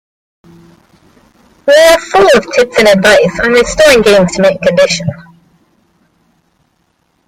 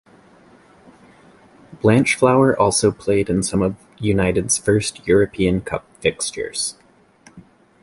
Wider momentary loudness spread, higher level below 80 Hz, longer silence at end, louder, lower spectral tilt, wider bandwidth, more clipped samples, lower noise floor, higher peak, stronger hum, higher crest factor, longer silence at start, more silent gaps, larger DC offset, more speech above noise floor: second, 6 LU vs 9 LU; about the same, -38 dBFS vs -42 dBFS; first, 2.05 s vs 0.4 s; first, -7 LUFS vs -18 LUFS; about the same, -4 dB/octave vs -4.5 dB/octave; first, 16 kHz vs 11.5 kHz; first, 0.2% vs under 0.1%; first, -58 dBFS vs -51 dBFS; about the same, 0 dBFS vs -2 dBFS; neither; second, 10 dB vs 18 dB; about the same, 1.65 s vs 1.7 s; neither; neither; first, 51 dB vs 33 dB